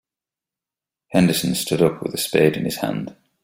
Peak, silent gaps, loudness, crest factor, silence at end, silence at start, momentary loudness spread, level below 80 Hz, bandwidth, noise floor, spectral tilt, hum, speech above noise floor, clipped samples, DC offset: -2 dBFS; none; -20 LUFS; 20 dB; 0.3 s; 1.1 s; 8 LU; -54 dBFS; 16.5 kHz; -89 dBFS; -5 dB/octave; none; 70 dB; under 0.1%; under 0.1%